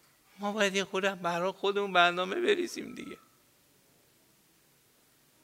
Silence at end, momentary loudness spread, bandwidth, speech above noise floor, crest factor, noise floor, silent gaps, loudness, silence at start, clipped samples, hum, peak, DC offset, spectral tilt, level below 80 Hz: 2.3 s; 18 LU; 16 kHz; 36 dB; 24 dB; -66 dBFS; none; -29 LUFS; 0.4 s; under 0.1%; none; -8 dBFS; under 0.1%; -3.5 dB/octave; -80 dBFS